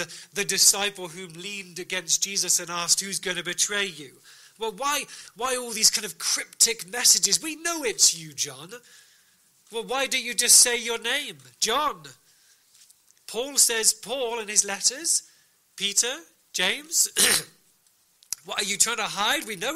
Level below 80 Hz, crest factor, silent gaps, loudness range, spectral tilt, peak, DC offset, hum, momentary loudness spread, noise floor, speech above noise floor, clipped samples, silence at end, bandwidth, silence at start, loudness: -64 dBFS; 24 dB; none; 4 LU; 0.5 dB/octave; -2 dBFS; under 0.1%; none; 17 LU; -64 dBFS; 38 dB; under 0.1%; 0 s; 16 kHz; 0 s; -22 LUFS